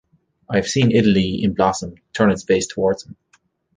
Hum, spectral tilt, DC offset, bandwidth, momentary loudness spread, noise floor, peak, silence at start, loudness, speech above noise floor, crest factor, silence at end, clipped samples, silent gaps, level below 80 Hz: none; -5.5 dB/octave; under 0.1%; 9.8 kHz; 9 LU; -61 dBFS; -2 dBFS; 0.5 s; -19 LUFS; 43 dB; 18 dB; 0.65 s; under 0.1%; none; -46 dBFS